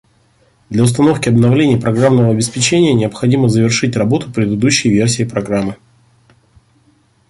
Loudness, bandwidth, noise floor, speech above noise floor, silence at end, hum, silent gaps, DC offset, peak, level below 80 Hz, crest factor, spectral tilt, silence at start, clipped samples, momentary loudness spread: -13 LUFS; 11.5 kHz; -54 dBFS; 41 dB; 1.55 s; none; none; under 0.1%; 0 dBFS; -46 dBFS; 14 dB; -5.5 dB/octave; 0.7 s; under 0.1%; 6 LU